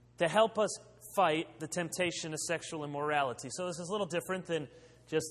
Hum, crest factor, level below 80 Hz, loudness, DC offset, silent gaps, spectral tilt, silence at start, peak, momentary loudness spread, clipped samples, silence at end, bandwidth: none; 20 dB; -70 dBFS; -34 LUFS; under 0.1%; none; -3.5 dB/octave; 0.2 s; -14 dBFS; 9 LU; under 0.1%; 0 s; 15.5 kHz